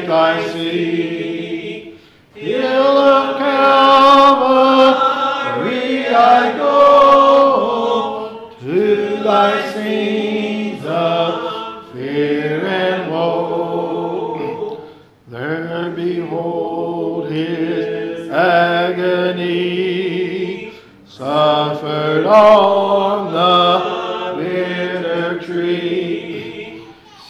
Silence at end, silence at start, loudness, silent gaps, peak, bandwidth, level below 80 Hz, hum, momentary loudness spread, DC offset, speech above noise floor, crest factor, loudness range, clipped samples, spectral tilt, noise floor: 0.05 s; 0 s; -15 LUFS; none; -2 dBFS; 12 kHz; -58 dBFS; none; 15 LU; under 0.1%; 27 dB; 14 dB; 10 LU; under 0.1%; -6 dB/octave; -41 dBFS